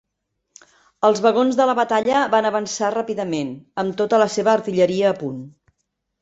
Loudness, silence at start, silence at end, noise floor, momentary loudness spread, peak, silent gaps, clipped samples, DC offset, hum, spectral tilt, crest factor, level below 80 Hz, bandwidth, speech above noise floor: -19 LUFS; 1 s; 0.75 s; -76 dBFS; 9 LU; -2 dBFS; none; under 0.1%; under 0.1%; none; -4.5 dB/octave; 18 dB; -64 dBFS; 8.2 kHz; 57 dB